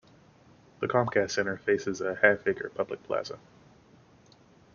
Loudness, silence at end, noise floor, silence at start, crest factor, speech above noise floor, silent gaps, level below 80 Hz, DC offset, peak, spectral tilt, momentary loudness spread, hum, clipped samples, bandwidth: -28 LUFS; 1.35 s; -58 dBFS; 0.8 s; 26 dB; 30 dB; none; -68 dBFS; under 0.1%; -6 dBFS; -3.5 dB/octave; 11 LU; none; under 0.1%; 7.2 kHz